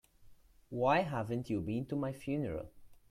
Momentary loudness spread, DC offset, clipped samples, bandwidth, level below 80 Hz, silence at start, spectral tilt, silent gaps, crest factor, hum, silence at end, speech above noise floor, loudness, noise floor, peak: 13 LU; under 0.1%; under 0.1%; 15.5 kHz; -62 dBFS; 0.2 s; -7.5 dB/octave; none; 20 dB; none; 0.15 s; 25 dB; -36 LUFS; -60 dBFS; -18 dBFS